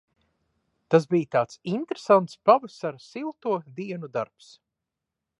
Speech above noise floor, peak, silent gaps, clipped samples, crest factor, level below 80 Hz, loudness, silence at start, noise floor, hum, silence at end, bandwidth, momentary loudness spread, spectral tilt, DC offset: 61 dB; -4 dBFS; none; under 0.1%; 22 dB; -76 dBFS; -25 LUFS; 0.9 s; -86 dBFS; none; 1.15 s; 11 kHz; 14 LU; -7 dB/octave; under 0.1%